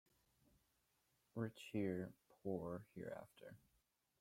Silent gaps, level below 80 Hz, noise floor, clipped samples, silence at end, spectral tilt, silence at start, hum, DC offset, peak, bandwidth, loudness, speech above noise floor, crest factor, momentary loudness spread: none; -80 dBFS; -84 dBFS; under 0.1%; 0.65 s; -7.5 dB/octave; 1.35 s; none; under 0.1%; -30 dBFS; 16.5 kHz; -49 LUFS; 36 dB; 20 dB; 17 LU